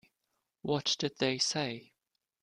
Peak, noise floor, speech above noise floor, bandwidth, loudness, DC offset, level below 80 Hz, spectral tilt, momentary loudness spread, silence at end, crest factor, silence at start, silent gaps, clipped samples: -16 dBFS; -85 dBFS; 52 dB; 12.5 kHz; -32 LUFS; under 0.1%; -72 dBFS; -3 dB/octave; 12 LU; 0.6 s; 20 dB; 0.65 s; none; under 0.1%